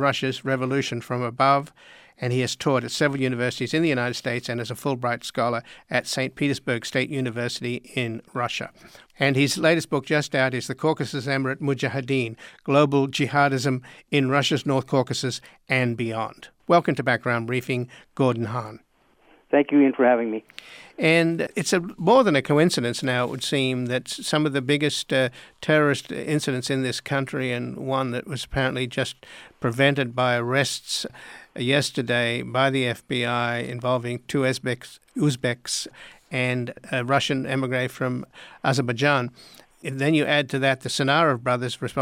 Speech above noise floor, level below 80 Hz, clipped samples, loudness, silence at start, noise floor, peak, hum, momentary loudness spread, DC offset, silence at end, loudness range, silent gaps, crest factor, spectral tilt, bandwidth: 35 dB; -60 dBFS; under 0.1%; -24 LUFS; 0 s; -59 dBFS; -6 dBFS; none; 10 LU; under 0.1%; 0 s; 4 LU; none; 18 dB; -5 dB/octave; 16.5 kHz